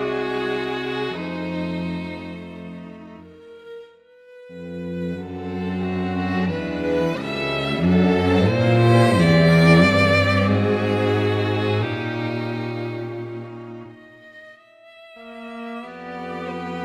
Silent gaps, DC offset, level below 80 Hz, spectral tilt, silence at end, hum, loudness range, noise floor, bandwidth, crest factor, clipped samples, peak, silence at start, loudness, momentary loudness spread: none; under 0.1%; -50 dBFS; -7 dB/octave; 0 s; none; 18 LU; -49 dBFS; 12.5 kHz; 20 dB; under 0.1%; -2 dBFS; 0 s; -20 LUFS; 22 LU